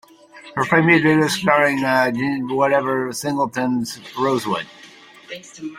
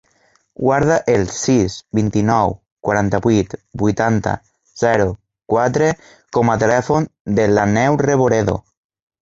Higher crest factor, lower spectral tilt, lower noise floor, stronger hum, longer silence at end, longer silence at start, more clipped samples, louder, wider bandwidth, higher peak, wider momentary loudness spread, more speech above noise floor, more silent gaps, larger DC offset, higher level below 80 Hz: about the same, 18 dB vs 16 dB; about the same, -5 dB/octave vs -6 dB/octave; second, -44 dBFS vs -59 dBFS; neither; second, 0 s vs 0.6 s; second, 0.35 s vs 0.6 s; neither; about the same, -18 LUFS vs -17 LUFS; first, 16 kHz vs 7.8 kHz; about the same, -2 dBFS vs -2 dBFS; first, 16 LU vs 7 LU; second, 25 dB vs 43 dB; second, none vs 2.72-2.77 s, 7.20-7.25 s; neither; second, -60 dBFS vs -42 dBFS